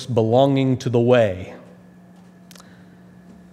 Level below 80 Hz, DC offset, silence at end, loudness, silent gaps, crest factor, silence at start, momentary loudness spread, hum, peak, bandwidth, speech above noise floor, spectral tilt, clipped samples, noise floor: -64 dBFS; under 0.1%; 1.95 s; -18 LUFS; none; 20 dB; 0 s; 13 LU; none; -2 dBFS; 12 kHz; 29 dB; -7.5 dB/octave; under 0.1%; -46 dBFS